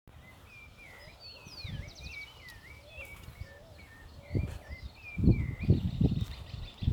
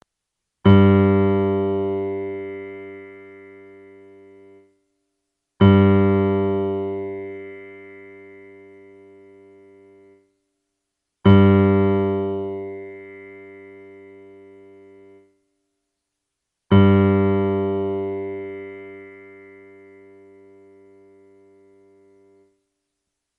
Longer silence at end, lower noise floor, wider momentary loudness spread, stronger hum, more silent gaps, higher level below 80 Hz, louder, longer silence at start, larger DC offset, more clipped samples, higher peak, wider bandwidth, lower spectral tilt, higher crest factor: second, 0 s vs 4.25 s; second, -53 dBFS vs -81 dBFS; second, 23 LU vs 27 LU; neither; neither; first, -42 dBFS vs -54 dBFS; second, -34 LUFS vs -18 LUFS; second, 0.05 s vs 0.65 s; neither; neither; second, -10 dBFS vs -2 dBFS; first, 17.5 kHz vs 4 kHz; second, -7.5 dB/octave vs -11 dB/octave; about the same, 24 dB vs 20 dB